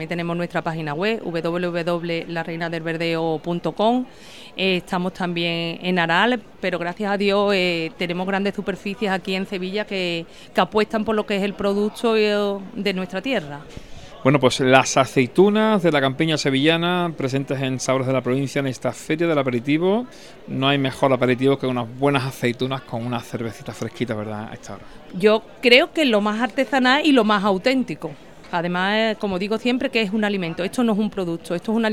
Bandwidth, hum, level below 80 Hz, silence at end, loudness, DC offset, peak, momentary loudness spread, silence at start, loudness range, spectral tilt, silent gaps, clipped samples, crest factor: 16 kHz; none; -54 dBFS; 0 s; -21 LUFS; 0.4%; 0 dBFS; 11 LU; 0 s; 6 LU; -5 dB/octave; none; under 0.1%; 20 dB